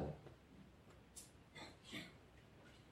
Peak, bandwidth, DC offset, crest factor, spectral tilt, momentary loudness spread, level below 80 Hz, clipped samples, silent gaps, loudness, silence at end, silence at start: -36 dBFS; 16 kHz; under 0.1%; 20 dB; -4.5 dB/octave; 12 LU; -68 dBFS; under 0.1%; none; -58 LUFS; 0 s; 0 s